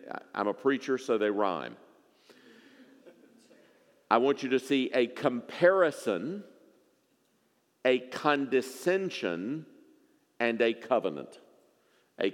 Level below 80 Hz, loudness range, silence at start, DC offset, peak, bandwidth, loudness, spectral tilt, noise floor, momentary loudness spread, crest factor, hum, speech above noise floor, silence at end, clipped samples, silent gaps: under -90 dBFS; 5 LU; 0 s; under 0.1%; -8 dBFS; 16 kHz; -29 LUFS; -5 dB/octave; -71 dBFS; 12 LU; 24 dB; none; 43 dB; 0 s; under 0.1%; none